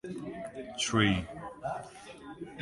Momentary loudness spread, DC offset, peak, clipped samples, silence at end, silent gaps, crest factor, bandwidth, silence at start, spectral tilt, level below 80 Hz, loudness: 20 LU; under 0.1%; -12 dBFS; under 0.1%; 0 s; none; 24 dB; 11.5 kHz; 0.05 s; -4.5 dB/octave; -54 dBFS; -33 LUFS